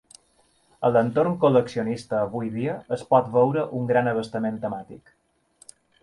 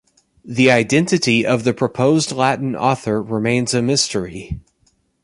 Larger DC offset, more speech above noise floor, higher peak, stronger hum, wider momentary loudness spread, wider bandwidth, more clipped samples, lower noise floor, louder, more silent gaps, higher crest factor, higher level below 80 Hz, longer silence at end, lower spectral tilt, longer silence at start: neither; second, 40 dB vs 45 dB; second, -6 dBFS vs 0 dBFS; neither; about the same, 10 LU vs 12 LU; about the same, 11.5 kHz vs 11.5 kHz; neither; about the same, -63 dBFS vs -62 dBFS; second, -23 LUFS vs -17 LUFS; neither; about the same, 18 dB vs 18 dB; second, -62 dBFS vs -46 dBFS; first, 1.05 s vs 0.65 s; first, -7.5 dB/octave vs -4.5 dB/octave; first, 0.8 s vs 0.45 s